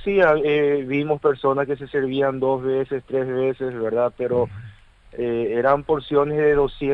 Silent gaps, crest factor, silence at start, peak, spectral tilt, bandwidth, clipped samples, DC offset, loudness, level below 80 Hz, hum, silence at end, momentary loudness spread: none; 16 dB; 0 s; -4 dBFS; -8.5 dB/octave; 4.8 kHz; under 0.1%; under 0.1%; -21 LUFS; -46 dBFS; none; 0 s; 6 LU